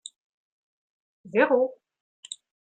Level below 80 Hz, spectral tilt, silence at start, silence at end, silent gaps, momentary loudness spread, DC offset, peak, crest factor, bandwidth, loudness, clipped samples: -84 dBFS; -4 dB/octave; 1.25 s; 0.45 s; 2.01-2.23 s; 20 LU; under 0.1%; -8 dBFS; 22 dB; 9.2 kHz; -24 LUFS; under 0.1%